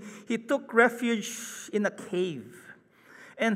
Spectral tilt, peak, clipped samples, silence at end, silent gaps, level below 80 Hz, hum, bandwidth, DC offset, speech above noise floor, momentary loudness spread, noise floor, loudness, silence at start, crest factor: -4 dB/octave; -8 dBFS; under 0.1%; 0 s; none; -84 dBFS; none; 15.5 kHz; under 0.1%; 26 dB; 16 LU; -55 dBFS; -28 LUFS; 0 s; 22 dB